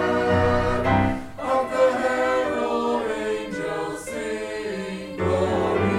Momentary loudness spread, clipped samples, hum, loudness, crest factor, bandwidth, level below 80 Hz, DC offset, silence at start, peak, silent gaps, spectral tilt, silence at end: 9 LU; under 0.1%; none; -24 LUFS; 16 dB; 14.5 kHz; -42 dBFS; under 0.1%; 0 s; -8 dBFS; none; -6 dB/octave; 0 s